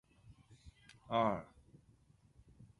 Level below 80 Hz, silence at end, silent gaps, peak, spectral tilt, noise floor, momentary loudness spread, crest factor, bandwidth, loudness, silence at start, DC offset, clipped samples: -68 dBFS; 0.15 s; none; -20 dBFS; -7 dB/octave; -68 dBFS; 27 LU; 24 dB; 11 kHz; -37 LUFS; 0.3 s; under 0.1%; under 0.1%